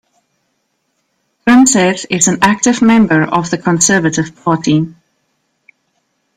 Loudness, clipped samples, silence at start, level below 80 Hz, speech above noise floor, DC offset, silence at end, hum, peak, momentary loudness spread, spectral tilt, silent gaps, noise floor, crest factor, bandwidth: -11 LUFS; under 0.1%; 1.45 s; -50 dBFS; 54 dB; under 0.1%; 1.45 s; none; 0 dBFS; 8 LU; -4 dB/octave; none; -65 dBFS; 14 dB; 15.5 kHz